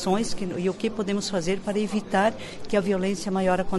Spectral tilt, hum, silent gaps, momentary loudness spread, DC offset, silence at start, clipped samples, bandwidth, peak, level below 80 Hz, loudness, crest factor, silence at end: -5 dB/octave; none; none; 4 LU; under 0.1%; 0 s; under 0.1%; 11.5 kHz; -10 dBFS; -46 dBFS; -26 LUFS; 16 dB; 0 s